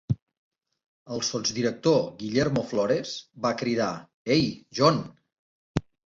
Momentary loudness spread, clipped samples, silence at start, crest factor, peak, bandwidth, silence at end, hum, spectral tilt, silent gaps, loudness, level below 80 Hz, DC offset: 11 LU; under 0.1%; 0.1 s; 20 dB; -6 dBFS; 7.8 kHz; 0.3 s; none; -5 dB/octave; 0.22-0.27 s, 0.38-0.51 s, 0.86-1.06 s, 4.14-4.25 s, 5.39-5.74 s; -27 LUFS; -54 dBFS; under 0.1%